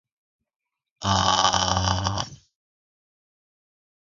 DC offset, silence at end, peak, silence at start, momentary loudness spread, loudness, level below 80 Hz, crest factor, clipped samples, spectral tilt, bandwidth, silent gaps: under 0.1%; 1.8 s; -2 dBFS; 1 s; 12 LU; -22 LUFS; -42 dBFS; 24 dB; under 0.1%; -3 dB/octave; 7.4 kHz; none